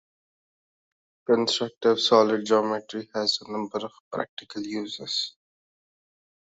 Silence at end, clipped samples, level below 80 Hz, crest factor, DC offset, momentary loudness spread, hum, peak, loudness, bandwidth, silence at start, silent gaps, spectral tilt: 1.15 s; under 0.1%; -74 dBFS; 24 dB; under 0.1%; 15 LU; none; -4 dBFS; -25 LUFS; 8 kHz; 1.3 s; 4.00-4.11 s, 4.29-4.37 s; -3.5 dB/octave